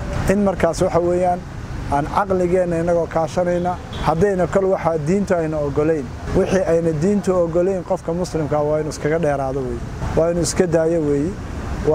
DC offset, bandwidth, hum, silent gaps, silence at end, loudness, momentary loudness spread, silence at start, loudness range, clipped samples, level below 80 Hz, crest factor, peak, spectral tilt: under 0.1%; 15.5 kHz; none; none; 0 s; -19 LUFS; 6 LU; 0 s; 1 LU; under 0.1%; -34 dBFS; 16 dB; -2 dBFS; -6.5 dB/octave